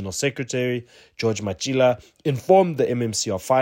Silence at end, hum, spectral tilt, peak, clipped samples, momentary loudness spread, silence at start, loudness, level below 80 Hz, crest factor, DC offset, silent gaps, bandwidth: 0 s; none; -5 dB/octave; -4 dBFS; under 0.1%; 9 LU; 0 s; -22 LUFS; -58 dBFS; 18 dB; under 0.1%; none; 16.5 kHz